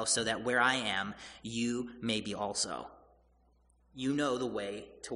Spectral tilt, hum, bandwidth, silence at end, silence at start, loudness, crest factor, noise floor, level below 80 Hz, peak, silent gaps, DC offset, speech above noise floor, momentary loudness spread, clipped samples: -2.5 dB/octave; none; 10.5 kHz; 0 s; 0 s; -33 LUFS; 22 dB; -68 dBFS; -64 dBFS; -14 dBFS; none; under 0.1%; 34 dB; 13 LU; under 0.1%